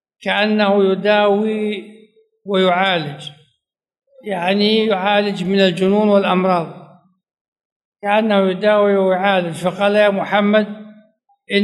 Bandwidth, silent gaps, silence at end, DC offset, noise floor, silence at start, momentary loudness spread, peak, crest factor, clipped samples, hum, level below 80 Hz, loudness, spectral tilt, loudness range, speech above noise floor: 12 kHz; 7.41-7.52 s, 7.65-7.92 s; 0 s; under 0.1%; -71 dBFS; 0.2 s; 12 LU; 0 dBFS; 16 dB; under 0.1%; none; -66 dBFS; -16 LUFS; -6.5 dB/octave; 3 LU; 56 dB